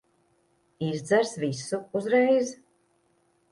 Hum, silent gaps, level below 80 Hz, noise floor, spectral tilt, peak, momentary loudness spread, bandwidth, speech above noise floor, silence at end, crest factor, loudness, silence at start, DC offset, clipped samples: none; none; -72 dBFS; -68 dBFS; -5 dB/octave; -10 dBFS; 11 LU; 11.5 kHz; 43 dB; 0.95 s; 18 dB; -26 LUFS; 0.8 s; under 0.1%; under 0.1%